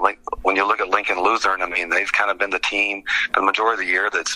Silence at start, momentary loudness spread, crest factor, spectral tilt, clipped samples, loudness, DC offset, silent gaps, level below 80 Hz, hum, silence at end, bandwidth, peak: 0 s; 3 LU; 20 dB; -1 dB/octave; under 0.1%; -19 LUFS; under 0.1%; none; -50 dBFS; none; 0 s; 14.5 kHz; 0 dBFS